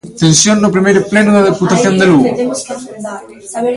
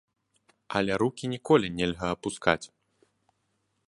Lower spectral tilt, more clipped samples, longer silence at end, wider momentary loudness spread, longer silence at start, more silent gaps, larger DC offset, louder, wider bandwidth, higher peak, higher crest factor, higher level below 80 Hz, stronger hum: about the same, -4.5 dB/octave vs -5 dB/octave; neither; second, 0 s vs 1.2 s; first, 17 LU vs 8 LU; second, 0.05 s vs 0.7 s; neither; neither; first, -10 LUFS vs -28 LUFS; about the same, 11.5 kHz vs 11.5 kHz; first, 0 dBFS vs -4 dBFS; second, 10 dB vs 26 dB; first, -48 dBFS vs -56 dBFS; neither